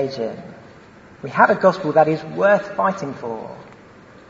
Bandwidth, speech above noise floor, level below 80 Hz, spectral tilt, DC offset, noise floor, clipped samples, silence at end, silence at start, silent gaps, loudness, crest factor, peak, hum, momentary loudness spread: 7.6 kHz; 26 dB; -60 dBFS; -6.5 dB/octave; under 0.1%; -45 dBFS; under 0.1%; 0.55 s; 0 s; none; -19 LUFS; 20 dB; 0 dBFS; none; 21 LU